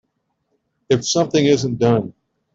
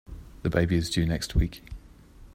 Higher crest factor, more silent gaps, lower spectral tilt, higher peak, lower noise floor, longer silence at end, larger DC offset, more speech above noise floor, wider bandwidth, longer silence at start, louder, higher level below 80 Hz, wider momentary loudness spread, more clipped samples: about the same, 16 dB vs 20 dB; neither; about the same, -5 dB/octave vs -6 dB/octave; first, -2 dBFS vs -8 dBFS; first, -71 dBFS vs -50 dBFS; first, 0.45 s vs 0 s; neither; first, 54 dB vs 24 dB; second, 7.8 kHz vs 16 kHz; first, 0.9 s vs 0.1 s; first, -17 LUFS vs -27 LUFS; second, -54 dBFS vs -36 dBFS; second, 5 LU vs 22 LU; neither